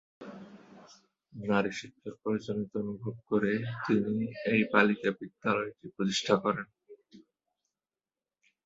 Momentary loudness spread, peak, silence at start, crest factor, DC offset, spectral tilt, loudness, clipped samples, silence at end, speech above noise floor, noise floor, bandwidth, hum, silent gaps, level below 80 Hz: 21 LU; -6 dBFS; 0.2 s; 26 dB; under 0.1%; -5.5 dB/octave; -31 LUFS; under 0.1%; 1.5 s; over 59 dB; under -90 dBFS; 7.8 kHz; none; none; -70 dBFS